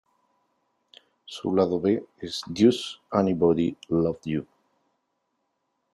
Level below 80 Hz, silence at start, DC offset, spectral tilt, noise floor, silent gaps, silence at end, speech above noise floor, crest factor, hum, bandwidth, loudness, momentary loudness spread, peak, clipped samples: -62 dBFS; 1.3 s; under 0.1%; -6.5 dB/octave; -77 dBFS; none; 1.5 s; 52 dB; 20 dB; none; 12 kHz; -25 LUFS; 12 LU; -6 dBFS; under 0.1%